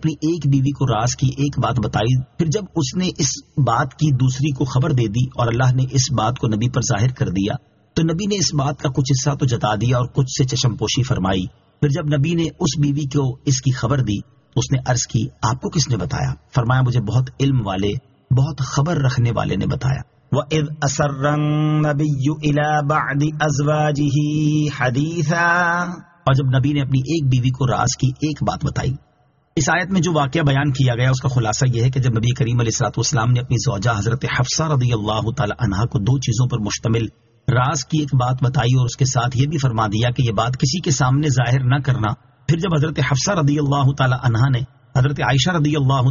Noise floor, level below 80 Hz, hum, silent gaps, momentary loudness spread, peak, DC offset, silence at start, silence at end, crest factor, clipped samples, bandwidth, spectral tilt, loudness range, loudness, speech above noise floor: -59 dBFS; -40 dBFS; none; none; 5 LU; -4 dBFS; under 0.1%; 0 s; 0 s; 14 dB; under 0.1%; 7.4 kHz; -6 dB/octave; 2 LU; -19 LUFS; 41 dB